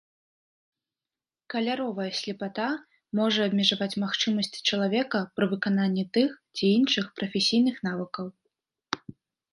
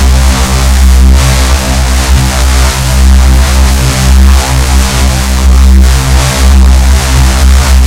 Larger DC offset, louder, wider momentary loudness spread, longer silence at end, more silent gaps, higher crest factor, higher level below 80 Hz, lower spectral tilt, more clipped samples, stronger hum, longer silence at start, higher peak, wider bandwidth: neither; second, -27 LUFS vs -7 LUFS; first, 12 LU vs 3 LU; first, 0.55 s vs 0 s; neither; first, 22 dB vs 4 dB; second, -72 dBFS vs -6 dBFS; about the same, -5 dB/octave vs -4.5 dB/octave; second, under 0.1% vs 8%; neither; first, 1.5 s vs 0 s; second, -6 dBFS vs 0 dBFS; second, 11.5 kHz vs 16 kHz